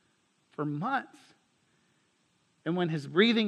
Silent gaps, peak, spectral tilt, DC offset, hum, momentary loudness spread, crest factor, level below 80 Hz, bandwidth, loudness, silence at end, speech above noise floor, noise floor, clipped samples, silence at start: none; -10 dBFS; -6.5 dB/octave; under 0.1%; none; 18 LU; 22 dB; -86 dBFS; 9.6 kHz; -31 LUFS; 0 s; 43 dB; -72 dBFS; under 0.1%; 0.6 s